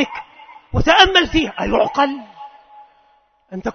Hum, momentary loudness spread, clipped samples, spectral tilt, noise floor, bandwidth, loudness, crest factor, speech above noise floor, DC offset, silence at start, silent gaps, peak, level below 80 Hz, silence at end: none; 21 LU; under 0.1%; -4.5 dB/octave; -57 dBFS; 6.6 kHz; -15 LUFS; 18 dB; 42 dB; under 0.1%; 0 s; none; 0 dBFS; -34 dBFS; 0.05 s